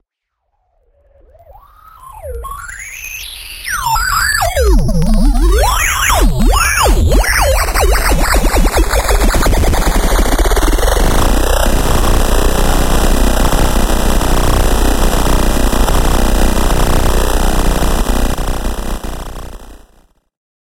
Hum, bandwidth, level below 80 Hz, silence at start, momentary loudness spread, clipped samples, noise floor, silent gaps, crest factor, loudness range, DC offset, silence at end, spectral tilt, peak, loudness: none; 17 kHz; -14 dBFS; 2.05 s; 12 LU; under 0.1%; -71 dBFS; none; 12 dB; 7 LU; under 0.1%; 1.05 s; -4 dB/octave; 0 dBFS; -13 LUFS